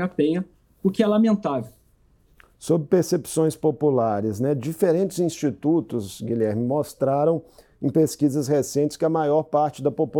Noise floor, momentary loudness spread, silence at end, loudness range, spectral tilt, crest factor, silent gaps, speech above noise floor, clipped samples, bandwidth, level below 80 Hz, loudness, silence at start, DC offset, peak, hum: -59 dBFS; 8 LU; 0 s; 1 LU; -7 dB/octave; 16 dB; none; 37 dB; under 0.1%; 19.5 kHz; -62 dBFS; -23 LUFS; 0 s; under 0.1%; -8 dBFS; none